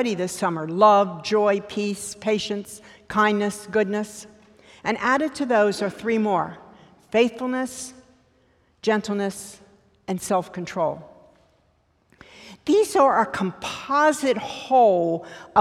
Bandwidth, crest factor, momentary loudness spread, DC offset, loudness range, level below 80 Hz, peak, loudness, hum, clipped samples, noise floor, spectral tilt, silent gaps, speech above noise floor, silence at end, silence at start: 15 kHz; 20 dB; 14 LU; under 0.1%; 7 LU; -62 dBFS; -4 dBFS; -22 LUFS; none; under 0.1%; -64 dBFS; -4.5 dB/octave; none; 42 dB; 0 s; 0 s